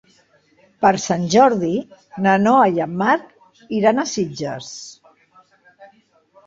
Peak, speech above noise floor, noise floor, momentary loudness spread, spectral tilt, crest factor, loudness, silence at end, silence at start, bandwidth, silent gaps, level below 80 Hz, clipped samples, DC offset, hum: -2 dBFS; 39 dB; -57 dBFS; 16 LU; -5 dB/octave; 18 dB; -18 LUFS; 0.6 s; 0.8 s; 7.8 kHz; none; -60 dBFS; under 0.1%; under 0.1%; none